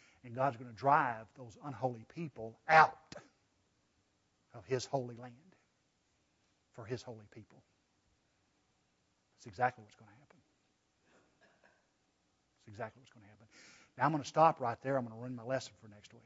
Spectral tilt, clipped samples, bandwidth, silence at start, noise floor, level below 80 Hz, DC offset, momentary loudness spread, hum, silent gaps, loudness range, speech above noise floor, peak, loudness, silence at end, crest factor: -4 dB/octave; under 0.1%; 7.6 kHz; 0.25 s; -78 dBFS; -78 dBFS; under 0.1%; 24 LU; none; none; 20 LU; 42 dB; -10 dBFS; -34 LUFS; 0.35 s; 28 dB